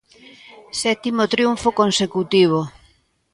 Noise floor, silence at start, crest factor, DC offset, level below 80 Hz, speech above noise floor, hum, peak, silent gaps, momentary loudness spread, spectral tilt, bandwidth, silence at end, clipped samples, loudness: -58 dBFS; 0.75 s; 16 dB; under 0.1%; -54 dBFS; 39 dB; none; -4 dBFS; none; 7 LU; -4.5 dB/octave; 11.5 kHz; 0.65 s; under 0.1%; -19 LUFS